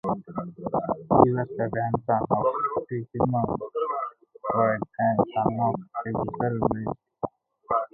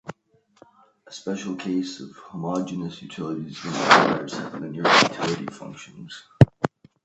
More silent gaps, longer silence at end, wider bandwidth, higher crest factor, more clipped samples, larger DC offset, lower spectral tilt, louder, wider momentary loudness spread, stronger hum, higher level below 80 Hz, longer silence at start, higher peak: neither; second, 0.05 s vs 0.4 s; second, 3.7 kHz vs 8.6 kHz; about the same, 26 dB vs 24 dB; neither; neither; first, -12 dB/octave vs -5 dB/octave; second, -26 LUFS vs -23 LUFS; second, 12 LU vs 23 LU; neither; about the same, -52 dBFS vs -50 dBFS; about the same, 0.05 s vs 0.05 s; about the same, 0 dBFS vs 0 dBFS